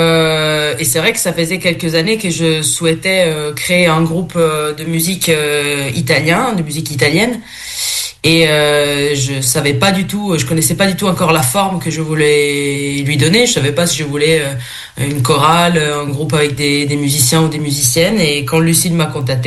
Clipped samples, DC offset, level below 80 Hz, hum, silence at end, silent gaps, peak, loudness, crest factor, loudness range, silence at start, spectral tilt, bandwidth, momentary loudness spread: under 0.1%; under 0.1%; -42 dBFS; none; 0 s; none; 0 dBFS; -13 LUFS; 14 dB; 1 LU; 0 s; -4 dB/octave; 13 kHz; 6 LU